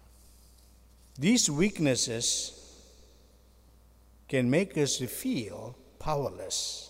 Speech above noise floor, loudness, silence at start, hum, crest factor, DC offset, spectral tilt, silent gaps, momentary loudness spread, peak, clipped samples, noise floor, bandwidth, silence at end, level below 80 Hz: 30 dB; -29 LUFS; 1.15 s; none; 20 dB; under 0.1%; -3.5 dB/octave; none; 16 LU; -12 dBFS; under 0.1%; -59 dBFS; 16 kHz; 0 s; -54 dBFS